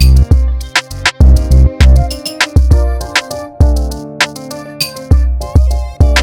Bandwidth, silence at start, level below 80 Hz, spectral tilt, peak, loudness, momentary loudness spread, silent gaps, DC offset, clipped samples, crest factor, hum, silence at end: 17 kHz; 0 s; -10 dBFS; -5 dB/octave; 0 dBFS; -12 LUFS; 10 LU; none; under 0.1%; under 0.1%; 10 dB; none; 0 s